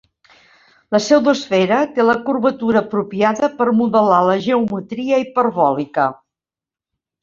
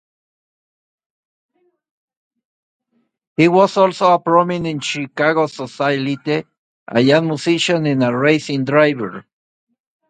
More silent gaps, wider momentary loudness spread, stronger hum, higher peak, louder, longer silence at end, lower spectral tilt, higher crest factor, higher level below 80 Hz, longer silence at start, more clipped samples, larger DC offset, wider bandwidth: second, none vs 6.58-6.86 s; second, 6 LU vs 10 LU; neither; about the same, -2 dBFS vs 0 dBFS; about the same, -16 LUFS vs -16 LUFS; first, 1.1 s vs 0.9 s; about the same, -5.5 dB/octave vs -5.5 dB/octave; about the same, 16 dB vs 18 dB; about the same, -60 dBFS vs -62 dBFS; second, 0.9 s vs 3.4 s; neither; neither; second, 7.6 kHz vs 9.4 kHz